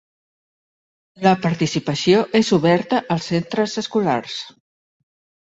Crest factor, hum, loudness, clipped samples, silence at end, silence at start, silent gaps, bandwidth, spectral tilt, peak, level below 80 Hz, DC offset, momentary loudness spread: 18 dB; none; -19 LUFS; under 0.1%; 0.95 s; 1.2 s; none; 8 kHz; -5.5 dB/octave; -2 dBFS; -58 dBFS; under 0.1%; 7 LU